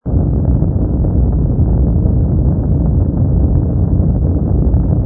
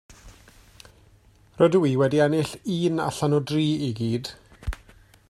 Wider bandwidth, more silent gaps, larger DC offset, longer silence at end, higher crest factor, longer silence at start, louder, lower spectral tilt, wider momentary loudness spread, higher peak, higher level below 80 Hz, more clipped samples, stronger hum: second, 1.7 kHz vs 13.5 kHz; neither; neither; second, 0 s vs 0.55 s; second, 12 dB vs 18 dB; about the same, 0.05 s vs 0.1 s; first, -14 LUFS vs -23 LUFS; first, -16.5 dB/octave vs -6.5 dB/octave; second, 1 LU vs 16 LU; first, 0 dBFS vs -6 dBFS; first, -16 dBFS vs -44 dBFS; neither; neither